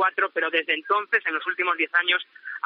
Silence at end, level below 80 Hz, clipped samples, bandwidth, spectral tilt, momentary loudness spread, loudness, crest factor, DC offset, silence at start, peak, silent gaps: 0.05 s; under -90 dBFS; under 0.1%; 6.2 kHz; 4 dB/octave; 4 LU; -23 LUFS; 18 dB; under 0.1%; 0 s; -6 dBFS; none